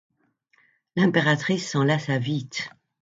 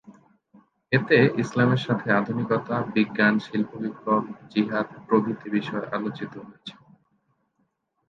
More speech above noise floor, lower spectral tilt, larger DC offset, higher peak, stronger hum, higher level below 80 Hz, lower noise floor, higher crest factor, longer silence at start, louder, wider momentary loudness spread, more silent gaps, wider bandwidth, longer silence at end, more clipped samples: second, 43 dB vs 49 dB; second, -5.5 dB/octave vs -7.5 dB/octave; neither; about the same, -6 dBFS vs -6 dBFS; neither; about the same, -66 dBFS vs -66 dBFS; second, -66 dBFS vs -73 dBFS; about the same, 20 dB vs 20 dB; first, 0.95 s vs 0.1 s; about the same, -24 LUFS vs -24 LUFS; about the same, 12 LU vs 12 LU; neither; about the same, 7.8 kHz vs 7.4 kHz; second, 0.3 s vs 1.35 s; neither